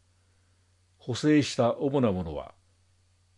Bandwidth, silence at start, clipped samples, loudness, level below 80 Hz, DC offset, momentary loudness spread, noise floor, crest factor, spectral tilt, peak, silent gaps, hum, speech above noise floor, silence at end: 11 kHz; 1.05 s; under 0.1%; -27 LUFS; -58 dBFS; under 0.1%; 18 LU; -66 dBFS; 18 dB; -6 dB/octave; -12 dBFS; none; 50 Hz at -50 dBFS; 40 dB; 0.9 s